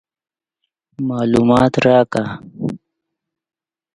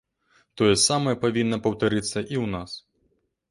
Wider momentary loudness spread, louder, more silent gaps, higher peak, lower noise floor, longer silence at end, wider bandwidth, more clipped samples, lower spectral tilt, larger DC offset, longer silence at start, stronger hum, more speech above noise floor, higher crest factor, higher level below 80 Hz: about the same, 14 LU vs 13 LU; first, -16 LUFS vs -23 LUFS; neither; first, 0 dBFS vs -6 dBFS; first, -80 dBFS vs -70 dBFS; first, 1.2 s vs 0.7 s; about the same, 11 kHz vs 11.5 kHz; neither; first, -7 dB/octave vs -4 dB/octave; neither; first, 1 s vs 0.55 s; neither; first, 65 dB vs 47 dB; about the same, 18 dB vs 18 dB; about the same, -48 dBFS vs -52 dBFS